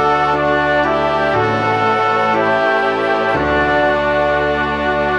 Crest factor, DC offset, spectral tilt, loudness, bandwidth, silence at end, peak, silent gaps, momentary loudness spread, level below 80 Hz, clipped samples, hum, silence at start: 12 dB; 0.4%; -6 dB/octave; -15 LUFS; 10 kHz; 0 s; -2 dBFS; none; 2 LU; -38 dBFS; under 0.1%; none; 0 s